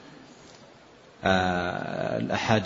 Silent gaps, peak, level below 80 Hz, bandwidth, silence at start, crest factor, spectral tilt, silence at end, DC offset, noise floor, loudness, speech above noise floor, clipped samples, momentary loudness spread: none; -6 dBFS; -56 dBFS; 7.8 kHz; 0 s; 22 dB; -5.5 dB/octave; 0 s; under 0.1%; -52 dBFS; -27 LUFS; 27 dB; under 0.1%; 24 LU